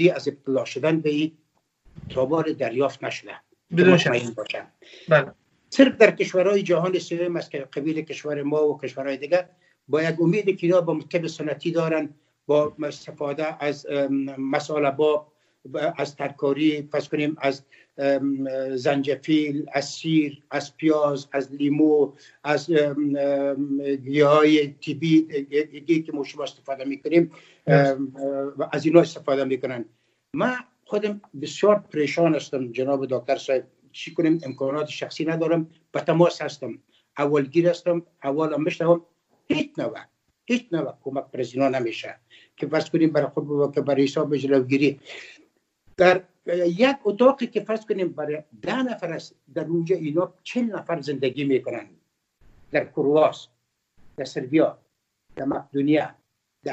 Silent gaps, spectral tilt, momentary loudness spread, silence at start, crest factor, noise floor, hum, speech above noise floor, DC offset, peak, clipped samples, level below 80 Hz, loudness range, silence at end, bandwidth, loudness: none; -6.5 dB/octave; 13 LU; 0 s; 22 dB; -62 dBFS; none; 39 dB; under 0.1%; 0 dBFS; under 0.1%; -68 dBFS; 5 LU; 0 s; 8.2 kHz; -23 LUFS